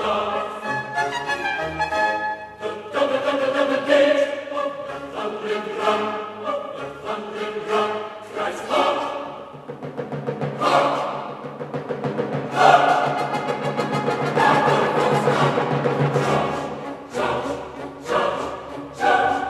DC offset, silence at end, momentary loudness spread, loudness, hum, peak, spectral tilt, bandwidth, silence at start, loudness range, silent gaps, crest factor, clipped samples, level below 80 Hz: under 0.1%; 0 s; 13 LU; -22 LUFS; none; 0 dBFS; -5.5 dB/octave; 13 kHz; 0 s; 6 LU; none; 22 dB; under 0.1%; -56 dBFS